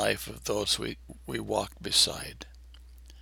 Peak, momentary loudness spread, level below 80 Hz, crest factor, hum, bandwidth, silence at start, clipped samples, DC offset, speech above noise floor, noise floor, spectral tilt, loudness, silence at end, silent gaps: -8 dBFS; 20 LU; -50 dBFS; 24 dB; none; over 20 kHz; 0 s; under 0.1%; under 0.1%; 19 dB; -50 dBFS; -2 dB/octave; -29 LUFS; 0 s; none